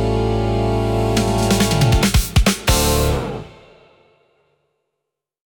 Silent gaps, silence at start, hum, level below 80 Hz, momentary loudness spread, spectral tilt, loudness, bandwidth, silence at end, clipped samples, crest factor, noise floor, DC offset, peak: none; 0 s; none; -26 dBFS; 5 LU; -5 dB/octave; -17 LUFS; 19 kHz; 2.05 s; under 0.1%; 16 dB; -79 dBFS; under 0.1%; -2 dBFS